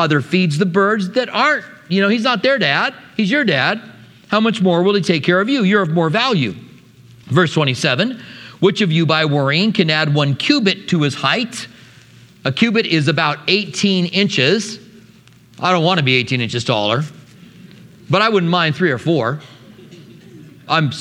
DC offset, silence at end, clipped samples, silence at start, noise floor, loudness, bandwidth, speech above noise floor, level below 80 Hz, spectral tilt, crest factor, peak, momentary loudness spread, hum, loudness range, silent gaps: under 0.1%; 0 s; under 0.1%; 0 s; -46 dBFS; -16 LUFS; 11.5 kHz; 30 dB; -62 dBFS; -5.5 dB/octave; 16 dB; 0 dBFS; 7 LU; none; 3 LU; none